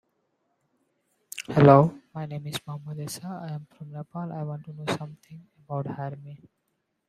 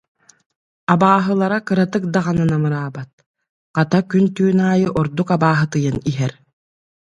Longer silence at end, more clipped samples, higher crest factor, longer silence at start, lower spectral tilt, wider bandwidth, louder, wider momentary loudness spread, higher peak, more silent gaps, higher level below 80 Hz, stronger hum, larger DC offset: about the same, 0.75 s vs 0.7 s; neither; first, 24 dB vs 18 dB; first, 1.35 s vs 0.9 s; about the same, -7 dB/octave vs -7.5 dB/octave; first, 15 kHz vs 8 kHz; second, -26 LUFS vs -17 LUFS; first, 23 LU vs 10 LU; about the same, -2 dBFS vs 0 dBFS; second, none vs 3.13-3.18 s, 3.26-3.34 s, 3.49-3.74 s; second, -62 dBFS vs -50 dBFS; neither; neither